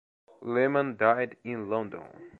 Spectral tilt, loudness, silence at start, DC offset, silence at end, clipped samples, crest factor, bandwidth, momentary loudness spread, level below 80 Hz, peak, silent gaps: -9 dB/octave; -28 LUFS; 0.4 s; under 0.1%; 0.05 s; under 0.1%; 22 dB; 4.3 kHz; 15 LU; -72 dBFS; -8 dBFS; none